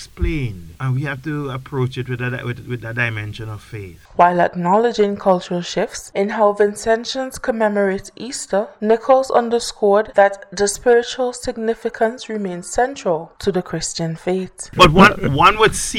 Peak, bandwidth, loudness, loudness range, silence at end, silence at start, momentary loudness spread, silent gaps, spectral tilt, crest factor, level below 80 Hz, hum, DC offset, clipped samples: 0 dBFS; 16.5 kHz; -18 LUFS; 6 LU; 0 s; 0 s; 13 LU; none; -4.5 dB/octave; 18 dB; -36 dBFS; none; under 0.1%; under 0.1%